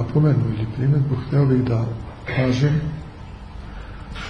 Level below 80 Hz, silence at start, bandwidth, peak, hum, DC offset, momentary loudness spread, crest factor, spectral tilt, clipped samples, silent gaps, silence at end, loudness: -38 dBFS; 0 s; 6.8 kHz; -6 dBFS; none; under 0.1%; 19 LU; 14 dB; -8.5 dB/octave; under 0.1%; none; 0 s; -21 LUFS